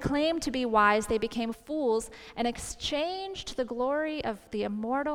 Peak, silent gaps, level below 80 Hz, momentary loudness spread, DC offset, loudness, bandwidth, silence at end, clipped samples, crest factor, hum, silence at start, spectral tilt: -10 dBFS; none; -52 dBFS; 10 LU; under 0.1%; -30 LUFS; 16.5 kHz; 0 s; under 0.1%; 20 dB; none; 0 s; -4 dB/octave